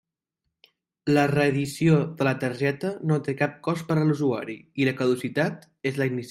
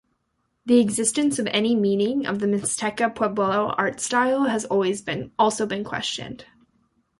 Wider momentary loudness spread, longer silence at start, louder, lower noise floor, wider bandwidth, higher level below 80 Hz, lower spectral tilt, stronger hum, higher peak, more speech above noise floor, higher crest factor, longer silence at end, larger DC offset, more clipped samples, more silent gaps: about the same, 8 LU vs 8 LU; first, 1.05 s vs 0.65 s; second, -25 LUFS vs -22 LUFS; first, -82 dBFS vs -73 dBFS; first, 15.5 kHz vs 11.5 kHz; about the same, -62 dBFS vs -60 dBFS; first, -7 dB/octave vs -4 dB/octave; neither; about the same, -8 dBFS vs -6 dBFS; first, 58 dB vs 51 dB; about the same, 18 dB vs 18 dB; second, 0 s vs 0.75 s; neither; neither; neither